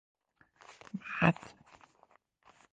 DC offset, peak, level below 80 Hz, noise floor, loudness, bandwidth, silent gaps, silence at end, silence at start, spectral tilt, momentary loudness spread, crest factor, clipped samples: under 0.1%; -10 dBFS; -70 dBFS; -68 dBFS; -33 LUFS; 8 kHz; none; 1.25 s; 0.7 s; -7 dB/octave; 25 LU; 28 dB; under 0.1%